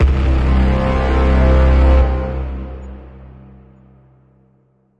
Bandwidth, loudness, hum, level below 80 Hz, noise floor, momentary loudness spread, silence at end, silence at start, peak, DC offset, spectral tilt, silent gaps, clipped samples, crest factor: 5.4 kHz; -15 LUFS; none; -16 dBFS; -57 dBFS; 19 LU; 1.75 s; 0 s; -2 dBFS; under 0.1%; -8.5 dB/octave; none; under 0.1%; 14 dB